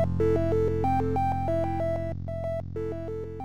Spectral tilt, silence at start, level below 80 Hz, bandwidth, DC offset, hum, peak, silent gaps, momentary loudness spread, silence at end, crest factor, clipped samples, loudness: -9.5 dB/octave; 0 s; -46 dBFS; 9.8 kHz; 1%; none; -14 dBFS; none; 8 LU; 0 s; 12 dB; under 0.1%; -28 LUFS